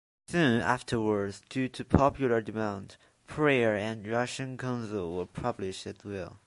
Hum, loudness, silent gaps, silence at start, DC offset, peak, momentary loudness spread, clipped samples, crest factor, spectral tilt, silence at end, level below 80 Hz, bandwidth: none; -30 LUFS; none; 0.3 s; under 0.1%; -4 dBFS; 12 LU; under 0.1%; 26 dB; -6 dB/octave; 0.1 s; -50 dBFS; 11.5 kHz